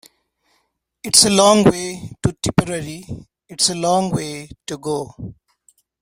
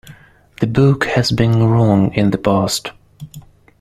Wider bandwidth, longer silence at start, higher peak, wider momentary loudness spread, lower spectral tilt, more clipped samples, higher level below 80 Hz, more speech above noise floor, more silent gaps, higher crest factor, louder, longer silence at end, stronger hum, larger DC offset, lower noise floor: first, 16.5 kHz vs 14 kHz; first, 1.05 s vs 0.05 s; about the same, 0 dBFS vs -2 dBFS; first, 23 LU vs 20 LU; second, -3.5 dB/octave vs -6 dB/octave; neither; about the same, -46 dBFS vs -42 dBFS; first, 50 dB vs 29 dB; neither; first, 20 dB vs 14 dB; about the same, -17 LUFS vs -15 LUFS; first, 0.7 s vs 0.4 s; neither; neither; first, -68 dBFS vs -43 dBFS